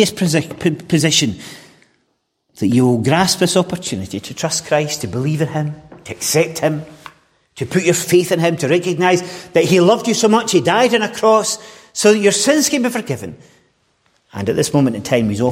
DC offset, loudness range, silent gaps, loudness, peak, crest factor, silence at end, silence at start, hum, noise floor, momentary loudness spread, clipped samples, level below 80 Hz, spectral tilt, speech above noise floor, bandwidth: under 0.1%; 5 LU; none; -16 LUFS; 0 dBFS; 16 dB; 0 s; 0 s; none; -67 dBFS; 13 LU; under 0.1%; -54 dBFS; -4.5 dB/octave; 51 dB; 16.5 kHz